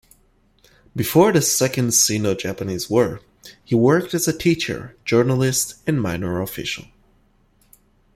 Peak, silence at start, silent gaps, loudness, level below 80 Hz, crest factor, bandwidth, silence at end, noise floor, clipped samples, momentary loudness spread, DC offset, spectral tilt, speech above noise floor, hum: -2 dBFS; 0.95 s; none; -19 LUFS; -52 dBFS; 18 dB; 16.5 kHz; 1.35 s; -59 dBFS; under 0.1%; 11 LU; under 0.1%; -4 dB/octave; 39 dB; none